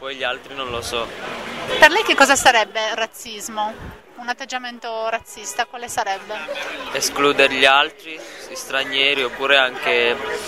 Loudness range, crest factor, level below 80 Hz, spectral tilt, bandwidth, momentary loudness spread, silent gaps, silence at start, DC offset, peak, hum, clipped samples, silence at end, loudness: 9 LU; 20 dB; -52 dBFS; -1 dB/octave; 16 kHz; 16 LU; none; 0 s; 0.2%; 0 dBFS; none; under 0.1%; 0 s; -18 LUFS